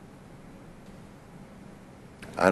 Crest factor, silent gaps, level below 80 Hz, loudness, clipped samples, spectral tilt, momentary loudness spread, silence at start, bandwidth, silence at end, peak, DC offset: 28 dB; none; -58 dBFS; -36 LUFS; under 0.1%; -5.5 dB/octave; 8 LU; 0 s; 12.5 kHz; 0 s; -4 dBFS; under 0.1%